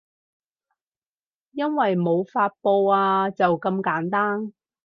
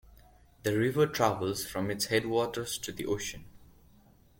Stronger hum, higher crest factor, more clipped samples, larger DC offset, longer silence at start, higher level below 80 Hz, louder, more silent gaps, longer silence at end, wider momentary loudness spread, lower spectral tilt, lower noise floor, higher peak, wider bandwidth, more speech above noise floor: neither; second, 16 dB vs 22 dB; neither; neither; first, 1.55 s vs 0.05 s; second, -74 dBFS vs -58 dBFS; first, -22 LUFS vs -31 LUFS; neither; second, 0.35 s vs 0.75 s; about the same, 9 LU vs 8 LU; first, -9 dB/octave vs -4.5 dB/octave; first, under -90 dBFS vs -60 dBFS; first, -6 dBFS vs -10 dBFS; second, 5.4 kHz vs 17 kHz; first, over 68 dB vs 30 dB